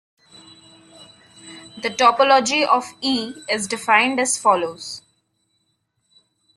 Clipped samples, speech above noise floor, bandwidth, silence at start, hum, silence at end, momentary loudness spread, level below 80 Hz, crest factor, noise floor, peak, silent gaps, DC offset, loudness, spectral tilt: under 0.1%; 51 dB; 12.5 kHz; 1 s; none; 1.55 s; 19 LU; -68 dBFS; 20 dB; -70 dBFS; -2 dBFS; none; under 0.1%; -18 LUFS; -1.5 dB/octave